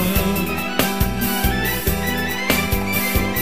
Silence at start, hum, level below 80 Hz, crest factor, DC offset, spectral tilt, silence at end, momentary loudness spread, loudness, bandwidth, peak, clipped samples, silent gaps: 0 s; none; -28 dBFS; 18 dB; 2%; -4 dB/octave; 0 s; 2 LU; -20 LUFS; 16 kHz; -2 dBFS; under 0.1%; none